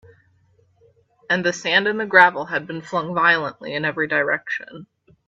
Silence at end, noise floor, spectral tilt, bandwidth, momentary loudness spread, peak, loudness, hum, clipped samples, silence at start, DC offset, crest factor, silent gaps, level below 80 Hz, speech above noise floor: 0.45 s; -60 dBFS; -4 dB/octave; 8.2 kHz; 13 LU; 0 dBFS; -19 LUFS; none; under 0.1%; 1.3 s; under 0.1%; 22 dB; none; -68 dBFS; 39 dB